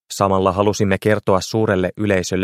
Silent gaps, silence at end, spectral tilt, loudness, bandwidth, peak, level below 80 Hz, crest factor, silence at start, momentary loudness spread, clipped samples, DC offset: none; 0 s; -5.5 dB/octave; -18 LUFS; 15.5 kHz; 0 dBFS; -48 dBFS; 18 dB; 0.1 s; 2 LU; under 0.1%; under 0.1%